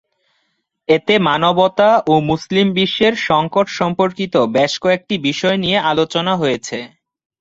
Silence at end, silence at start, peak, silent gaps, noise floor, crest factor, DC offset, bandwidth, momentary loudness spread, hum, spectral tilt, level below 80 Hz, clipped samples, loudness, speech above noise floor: 0.55 s; 0.9 s; 0 dBFS; none; -68 dBFS; 16 dB; under 0.1%; 7.8 kHz; 5 LU; none; -5 dB/octave; -52 dBFS; under 0.1%; -15 LUFS; 53 dB